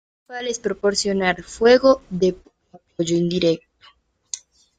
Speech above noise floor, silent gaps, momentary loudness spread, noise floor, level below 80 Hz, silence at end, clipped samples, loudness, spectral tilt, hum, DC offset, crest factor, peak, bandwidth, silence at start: 35 dB; none; 18 LU; -54 dBFS; -52 dBFS; 0.4 s; under 0.1%; -20 LUFS; -4.5 dB/octave; none; under 0.1%; 20 dB; -2 dBFS; 9.4 kHz; 0.3 s